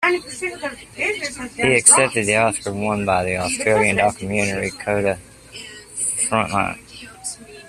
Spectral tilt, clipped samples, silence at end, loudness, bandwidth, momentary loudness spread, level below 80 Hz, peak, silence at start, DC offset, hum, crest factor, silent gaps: -3 dB/octave; under 0.1%; 0 s; -18 LUFS; 14.5 kHz; 17 LU; -50 dBFS; 0 dBFS; 0 s; under 0.1%; none; 20 dB; none